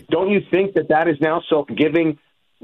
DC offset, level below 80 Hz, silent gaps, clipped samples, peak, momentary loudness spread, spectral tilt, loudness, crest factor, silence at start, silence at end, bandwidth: under 0.1%; -58 dBFS; none; under 0.1%; -6 dBFS; 4 LU; -9 dB/octave; -18 LUFS; 14 dB; 0.1 s; 0.5 s; 4.2 kHz